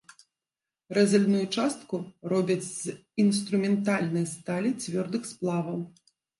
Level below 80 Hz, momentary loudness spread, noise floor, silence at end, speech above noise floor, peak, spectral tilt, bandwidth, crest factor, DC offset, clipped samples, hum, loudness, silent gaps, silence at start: -74 dBFS; 11 LU; under -90 dBFS; 0.5 s; over 63 dB; -10 dBFS; -5.5 dB/octave; 11.5 kHz; 18 dB; under 0.1%; under 0.1%; none; -28 LUFS; none; 0.9 s